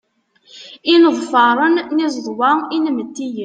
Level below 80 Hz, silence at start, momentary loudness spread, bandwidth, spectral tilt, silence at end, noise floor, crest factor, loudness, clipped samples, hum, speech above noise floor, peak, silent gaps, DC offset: -70 dBFS; 0.55 s; 11 LU; 9 kHz; -3.5 dB/octave; 0 s; -54 dBFS; 14 dB; -15 LUFS; under 0.1%; none; 39 dB; -2 dBFS; none; under 0.1%